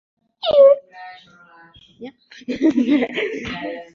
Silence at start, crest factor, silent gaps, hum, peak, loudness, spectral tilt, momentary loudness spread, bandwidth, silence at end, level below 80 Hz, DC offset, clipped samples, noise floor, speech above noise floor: 0.45 s; 18 dB; none; none; -2 dBFS; -17 LUFS; -5.5 dB/octave; 26 LU; 7 kHz; 0.1 s; -56 dBFS; under 0.1%; under 0.1%; -48 dBFS; 26 dB